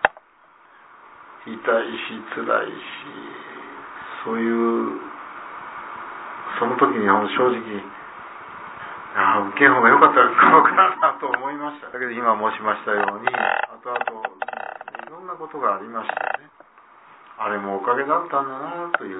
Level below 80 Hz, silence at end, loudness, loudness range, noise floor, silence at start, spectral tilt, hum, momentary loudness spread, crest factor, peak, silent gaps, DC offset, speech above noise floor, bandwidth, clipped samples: -70 dBFS; 0 s; -20 LUFS; 12 LU; -53 dBFS; 0 s; -8.5 dB/octave; none; 23 LU; 22 dB; 0 dBFS; none; under 0.1%; 33 dB; 4 kHz; under 0.1%